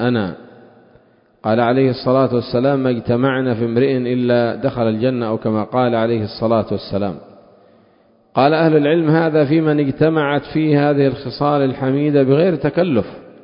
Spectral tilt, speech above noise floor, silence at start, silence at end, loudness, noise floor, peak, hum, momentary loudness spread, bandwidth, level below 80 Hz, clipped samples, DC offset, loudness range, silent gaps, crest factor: -12.5 dB/octave; 38 dB; 0 s; 0.15 s; -16 LUFS; -54 dBFS; 0 dBFS; none; 7 LU; 5.4 kHz; -50 dBFS; under 0.1%; under 0.1%; 4 LU; none; 16 dB